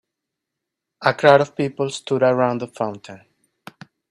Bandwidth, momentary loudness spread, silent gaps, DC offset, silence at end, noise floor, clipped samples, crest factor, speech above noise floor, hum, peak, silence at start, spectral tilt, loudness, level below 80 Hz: 11.5 kHz; 13 LU; none; under 0.1%; 0.95 s; -82 dBFS; under 0.1%; 22 dB; 64 dB; none; 0 dBFS; 1 s; -5.5 dB/octave; -19 LUFS; -66 dBFS